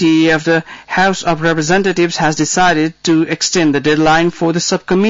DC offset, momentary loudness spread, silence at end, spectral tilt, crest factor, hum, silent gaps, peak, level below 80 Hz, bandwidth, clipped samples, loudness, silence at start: under 0.1%; 4 LU; 0 s; -4 dB/octave; 10 dB; none; none; -4 dBFS; -42 dBFS; 7.8 kHz; under 0.1%; -13 LUFS; 0 s